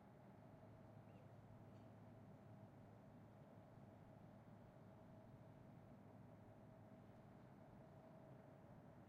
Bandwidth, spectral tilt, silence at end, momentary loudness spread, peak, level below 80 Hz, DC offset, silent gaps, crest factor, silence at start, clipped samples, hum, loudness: 6.4 kHz; -8 dB/octave; 0 s; 1 LU; -50 dBFS; -82 dBFS; under 0.1%; none; 14 dB; 0 s; under 0.1%; none; -65 LUFS